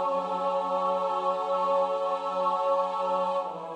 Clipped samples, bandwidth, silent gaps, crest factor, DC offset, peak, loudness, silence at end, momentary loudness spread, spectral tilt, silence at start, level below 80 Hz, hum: under 0.1%; 9.2 kHz; none; 12 dB; under 0.1%; -14 dBFS; -28 LUFS; 0 s; 3 LU; -5.5 dB/octave; 0 s; -84 dBFS; none